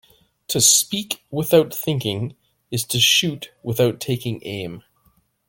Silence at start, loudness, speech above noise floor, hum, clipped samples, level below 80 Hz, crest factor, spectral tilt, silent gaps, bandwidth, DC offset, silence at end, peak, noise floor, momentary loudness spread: 0.5 s; -19 LUFS; 41 dB; none; under 0.1%; -56 dBFS; 20 dB; -3 dB/octave; none; 17 kHz; under 0.1%; 0.7 s; 0 dBFS; -62 dBFS; 16 LU